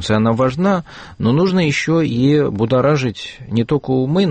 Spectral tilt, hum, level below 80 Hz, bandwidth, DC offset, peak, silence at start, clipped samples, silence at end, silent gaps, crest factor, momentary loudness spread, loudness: -7 dB/octave; none; -46 dBFS; 8.8 kHz; under 0.1%; -4 dBFS; 0 s; under 0.1%; 0 s; none; 12 dB; 7 LU; -16 LUFS